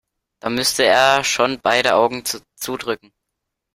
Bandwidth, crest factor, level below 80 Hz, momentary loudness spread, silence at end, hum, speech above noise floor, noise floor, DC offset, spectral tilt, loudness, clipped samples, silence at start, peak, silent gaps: 16 kHz; 20 dB; -56 dBFS; 13 LU; 0.8 s; none; 61 dB; -79 dBFS; under 0.1%; -2 dB/octave; -17 LUFS; under 0.1%; 0.45 s; 0 dBFS; none